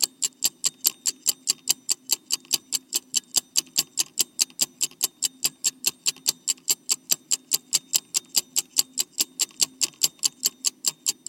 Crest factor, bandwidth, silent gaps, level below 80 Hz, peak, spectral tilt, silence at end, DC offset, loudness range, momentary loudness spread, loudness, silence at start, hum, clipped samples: 28 dB; 19.5 kHz; none; -74 dBFS; 0 dBFS; 2 dB/octave; 0.15 s; under 0.1%; 1 LU; 2 LU; -24 LUFS; 0 s; none; under 0.1%